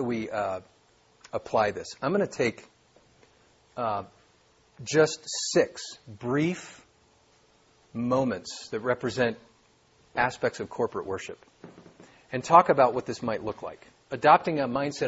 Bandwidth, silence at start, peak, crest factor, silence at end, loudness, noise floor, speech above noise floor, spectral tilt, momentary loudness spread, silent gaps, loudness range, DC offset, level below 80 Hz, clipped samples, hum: 8 kHz; 0 s; -4 dBFS; 24 dB; 0 s; -27 LUFS; -63 dBFS; 36 dB; -4.5 dB/octave; 19 LU; none; 7 LU; under 0.1%; -64 dBFS; under 0.1%; none